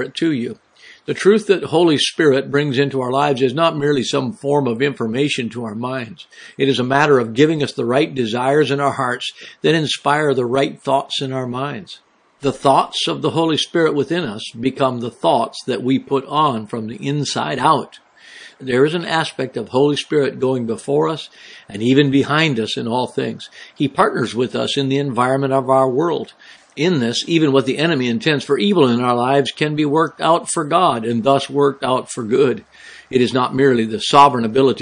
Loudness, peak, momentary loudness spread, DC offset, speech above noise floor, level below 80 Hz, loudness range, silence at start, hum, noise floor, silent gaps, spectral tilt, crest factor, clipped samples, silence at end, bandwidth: -17 LUFS; 0 dBFS; 10 LU; under 0.1%; 24 dB; -62 dBFS; 3 LU; 0 s; none; -41 dBFS; none; -5.5 dB/octave; 18 dB; under 0.1%; 0 s; 10.5 kHz